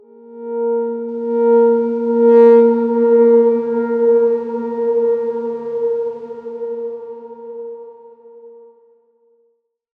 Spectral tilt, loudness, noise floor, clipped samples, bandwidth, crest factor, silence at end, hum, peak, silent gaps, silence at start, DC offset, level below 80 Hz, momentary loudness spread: -9.5 dB/octave; -15 LUFS; -64 dBFS; under 0.1%; 3.2 kHz; 16 dB; 1.5 s; none; -2 dBFS; none; 0.3 s; under 0.1%; -74 dBFS; 20 LU